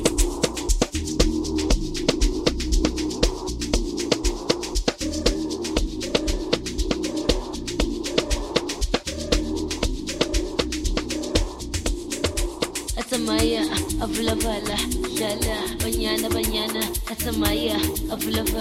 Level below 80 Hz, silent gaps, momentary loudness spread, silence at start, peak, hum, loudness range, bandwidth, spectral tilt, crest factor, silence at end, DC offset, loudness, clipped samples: -30 dBFS; none; 4 LU; 0 s; -2 dBFS; none; 2 LU; 16.5 kHz; -4 dB/octave; 22 dB; 0 s; under 0.1%; -24 LUFS; under 0.1%